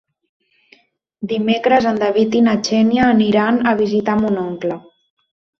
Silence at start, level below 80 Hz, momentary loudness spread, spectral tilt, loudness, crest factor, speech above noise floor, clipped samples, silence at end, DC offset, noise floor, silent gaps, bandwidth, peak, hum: 1.2 s; -52 dBFS; 10 LU; -6 dB/octave; -16 LUFS; 16 dB; 38 dB; under 0.1%; 0.8 s; under 0.1%; -54 dBFS; none; 6.8 kHz; -2 dBFS; none